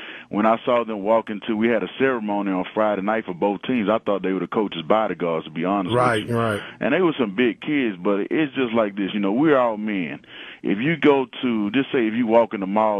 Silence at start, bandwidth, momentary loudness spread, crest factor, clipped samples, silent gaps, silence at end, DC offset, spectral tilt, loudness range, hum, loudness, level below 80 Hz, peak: 0 s; 12 kHz; 7 LU; 18 dB; under 0.1%; none; 0 s; under 0.1%; -7 dB/octave; 1 LU; none; -22 LUFS; -62 dBFS; -2 dBFS